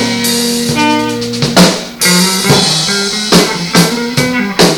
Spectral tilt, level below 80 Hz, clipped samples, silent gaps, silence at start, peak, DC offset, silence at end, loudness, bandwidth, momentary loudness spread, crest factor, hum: -3.5 dB/octave; -40 dBFS; 0.7%; none; 0 s; 0 dBFS; under 0.1%; 0 s; -10 LUFS; 19.5 kHz; 5 LU; 10 dB; none